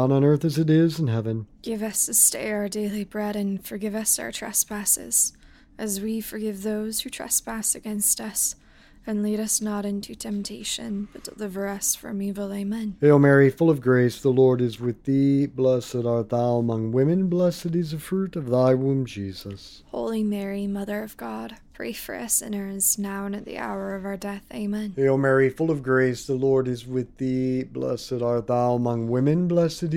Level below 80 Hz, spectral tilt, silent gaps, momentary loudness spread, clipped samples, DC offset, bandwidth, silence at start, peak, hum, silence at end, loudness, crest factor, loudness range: -54 dBFS; -5 dB/octave; none; 12 LU; under 0.1%; under 0.1%; 17 kHz; 0 s; -4 dBFS; none; 0 s; -24 LUFS; 20 dB; 7 LU